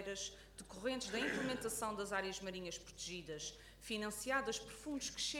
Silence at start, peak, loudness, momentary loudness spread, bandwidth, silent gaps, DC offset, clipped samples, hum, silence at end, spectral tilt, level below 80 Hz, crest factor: 0 s; -24 dBFS; -43 LUFS; 9 LU; 18 kHz; none; under 0.1%; under 0.1%; none; 0 s; -2.5 dB/octave; -64 dBFS; 20 dB